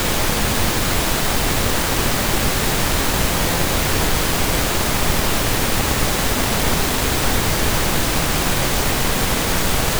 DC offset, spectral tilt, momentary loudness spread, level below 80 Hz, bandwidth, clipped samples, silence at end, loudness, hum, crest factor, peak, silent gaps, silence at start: under 0.1%; -3 dB/octave; 0 LU; -24 dBFS; over 20 kHz; under 0.1%; 0 s; -18 LUFS; none; 12 dB; -6 dBFS; none; 0 s